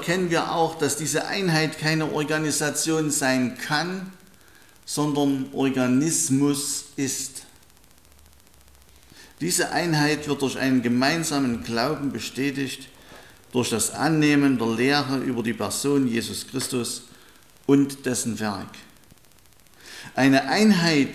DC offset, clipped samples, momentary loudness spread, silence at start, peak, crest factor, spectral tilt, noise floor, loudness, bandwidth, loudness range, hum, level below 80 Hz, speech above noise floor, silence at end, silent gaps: 0.2%; under 0.1%; 11 LU; 0 s; -6 dBFS; 18 dB; -4 dB/octave; -55 dBFS; -23 LUFS; 15.5 kHz; 4 LU; none; -58 dBFS; 32 dB; 0 s; none